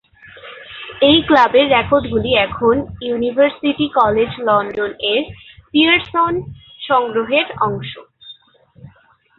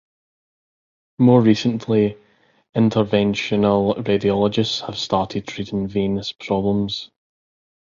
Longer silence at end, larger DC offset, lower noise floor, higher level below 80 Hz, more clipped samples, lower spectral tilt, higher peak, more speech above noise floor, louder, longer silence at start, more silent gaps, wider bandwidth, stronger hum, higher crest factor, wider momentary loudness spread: second, 0.5 s vs 0.9 s; neither; second, -51 dBFS vs under -90 dBFS; first, -44 dBFS vs -50 dBFS; neither; about the same, -7 dB/octave vs -6.5 dB/octave; about the same, 0 dBFS vs -2 dBFS; second, 36 dB vs over 71 dB; first, -15 LUFS vs -20 LUFS; second, 0.35 s vs 1.2 s; second, none vs 2.69-2.73 s; second, 6.6 kHz vs 7.6 kHz; neither; about the same, 16 dB vs 18 dB; first, 20 LU vs 11 LU